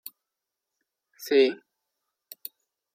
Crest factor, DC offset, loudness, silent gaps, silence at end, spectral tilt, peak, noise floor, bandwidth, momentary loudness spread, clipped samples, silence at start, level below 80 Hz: 20 dB; under 0.1%; -23 LUFS; none; 1.4 s; -3 dB/octave; -10 dBFS; -86 dBFS; 16 kHz; 22 LU; under 0.1%; 1.2 s; -86 dBFS